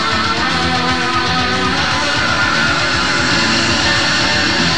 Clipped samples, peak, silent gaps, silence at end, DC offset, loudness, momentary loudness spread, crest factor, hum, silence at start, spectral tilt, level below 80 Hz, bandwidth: under 0.1%; -2 dBFS; none; 0 s; 3%; -13 LUFS; 2 LU; 12 dB; none; 0 s; -3 dB/octave; -34 dBFS; 12.5 kHz